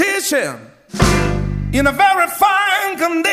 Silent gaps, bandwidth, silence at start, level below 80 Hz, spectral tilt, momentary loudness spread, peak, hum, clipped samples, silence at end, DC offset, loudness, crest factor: none; 15.5 kHz; 0 s; -28 dBFS; -4 dB/octave; 9 LU; -2 dBFS; none; under 0.1%; 0 s; under 0.1%; -15 LUFS; 14 dB